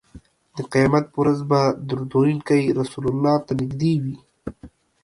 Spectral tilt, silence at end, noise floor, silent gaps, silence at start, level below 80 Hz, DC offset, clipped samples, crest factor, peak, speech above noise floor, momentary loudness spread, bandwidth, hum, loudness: -7.5 dB/octave; 0.35 s; -48 dBFS; none; 0.15 s; -50 dBFS; under 0.1%; under 0.1%; 18 dB; -4 dBFS; 28 dB; 16 LU; 11.5 kHz; none; -21 LUFS